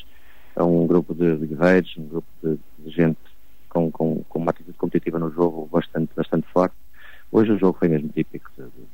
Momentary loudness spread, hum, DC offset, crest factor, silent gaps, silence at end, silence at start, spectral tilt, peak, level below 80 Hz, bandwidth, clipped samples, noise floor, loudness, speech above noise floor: 12 LU; none; 2%; 18 dB; none; 0.25 s; 0.55 s; -9 dB/octave; -4 dBFS; -54 dBFS; 16 kHz; under 0.1%; -52 dBFS; -22 LUFS; 30 dB